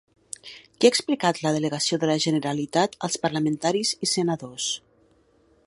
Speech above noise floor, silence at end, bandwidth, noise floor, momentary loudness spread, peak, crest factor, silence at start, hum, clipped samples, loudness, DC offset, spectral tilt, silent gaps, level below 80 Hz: 37 dB; 0.9 s; 11.5 kHz; -61 dBFS; 14 LU; -4 dBFS; 22 dB; 0.45 s; none; under 0.1%; -24 LUFS; under 0.1%; -4 dB/octave; none; -66 dBFS